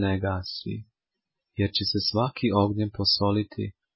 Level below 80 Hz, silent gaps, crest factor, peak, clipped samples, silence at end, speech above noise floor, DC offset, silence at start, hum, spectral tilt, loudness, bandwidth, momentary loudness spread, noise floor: -46 dBFS; none; 18 dB; -10 dBFS; under 0.1%; 0.25 s; 60 dB; under 0.1%; 0 s; none; -9 dB/octave; -26 LUFS; 5.8 kHz; 12 LU; -86 dBFS